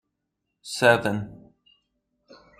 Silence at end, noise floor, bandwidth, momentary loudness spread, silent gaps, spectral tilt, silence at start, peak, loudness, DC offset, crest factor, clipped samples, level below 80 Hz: 1.25 s; -80 dBFS; 15 kHz; 22 LU; none; -4.5 dB/octave; 0.65 s; -2 dBFS; -22 LUFS; under 0.1%; 24 dB; under 0.1%; -64 dBFS